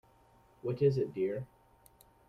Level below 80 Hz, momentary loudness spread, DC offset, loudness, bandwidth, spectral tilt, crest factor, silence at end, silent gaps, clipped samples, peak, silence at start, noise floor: -68 dBFS; 12 LU; under 0.1%; -34 LUFS; 15 kHz; -9 dB/octave; 20 dB; 0.85 s; none; under 0.1%; -16 dBFS; 0.65 s; -64 dBFS